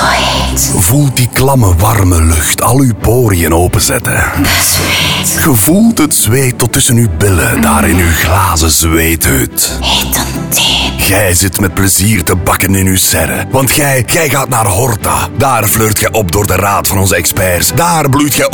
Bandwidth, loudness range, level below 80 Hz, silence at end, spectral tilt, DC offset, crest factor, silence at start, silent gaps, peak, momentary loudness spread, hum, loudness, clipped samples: over 20 kHz; 1 LU; -22 dBFS; 0 s; -4 dB/octave; 1%; 10 dB; 0 s; none; 0 dBFS; 3 LU; none; -9 LUFS; under 0.1%